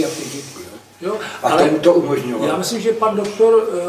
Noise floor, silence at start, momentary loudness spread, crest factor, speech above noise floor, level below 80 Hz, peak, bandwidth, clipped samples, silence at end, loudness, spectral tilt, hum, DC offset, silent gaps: -37 dBFS; 0 s; 16 LU; 16 dB; 21 dB; -58 dBFS; 0 dBFS; 16 kHz; under 0.1%; 0 s; -17 LUFS; -4.5 dB/octave; none; under 0.1%; none